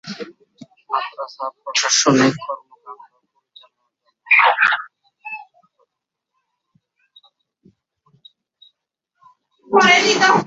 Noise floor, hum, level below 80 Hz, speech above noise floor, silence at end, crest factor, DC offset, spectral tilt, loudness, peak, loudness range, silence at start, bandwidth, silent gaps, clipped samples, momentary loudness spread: -81 dBFS; none; -66 dBFS; 64 dB; 0 s; 20 dB; under 0.1%; -2.5 dB/octave; -15 LUFS; 0 dBFS; 10 LU; 0.05 s; 8 kHz; none; under 0.1%; 22 LU